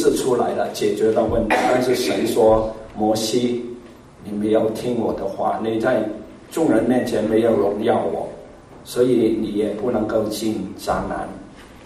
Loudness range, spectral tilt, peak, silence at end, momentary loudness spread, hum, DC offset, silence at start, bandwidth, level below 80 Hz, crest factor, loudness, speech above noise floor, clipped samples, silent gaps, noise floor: 3 LU; -5.5 dB/octave; -4 dBFS; 0 s; 12 LU; none; under 0.1%; 0 s; 15.5 kHz; -44 dBFS; 16 dB; -20 LUFS; 22 dB; under 0.1%; none; -41 dBFS